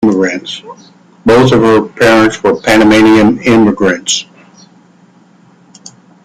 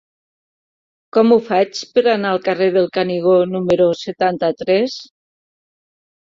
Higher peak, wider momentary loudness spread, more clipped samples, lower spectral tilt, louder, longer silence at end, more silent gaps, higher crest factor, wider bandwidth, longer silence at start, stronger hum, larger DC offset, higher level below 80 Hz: about the same, 0 dBFS vs -2 dBFS; first, 10 LU vs 6 LU; neither; about the same, -5 dB/octave vs -6 dB/octave; first, -8 LUFS vs -16 LUFS; first, 2 s vs 1.25 s; neither; second, 10 dB vs 16 dB; first, 14.5 kHz vs 7.6 kHz; second, 0 s vs 1.15 s; neither; neither; first, -40 dBFS vs -60 dBFS